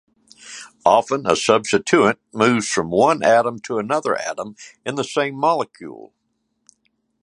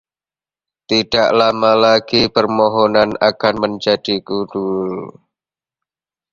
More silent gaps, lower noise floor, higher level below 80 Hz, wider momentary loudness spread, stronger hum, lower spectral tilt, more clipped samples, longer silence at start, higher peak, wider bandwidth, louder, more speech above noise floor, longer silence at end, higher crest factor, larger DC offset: neither; second, -70 dBFS vs under -90 dBFS; second, -60 dBFS vs -50 dBFS; first, 17 LU vs 9 LU; neither; about the same, -4 dB/octave vs -5 dB/octave; neither; second, 0.45 s vs 0.9 s; about the same, 0 dBFS vs 0 dBFS; first, 11.5 kHz vs 7.4 kHz; second, -18 LUFS vs -15 LUFS; second, 52 dB vs over 75 dB; about the same, 1.2 s vs 1.2 s; about the same, 20 dB vs 16 dB; neither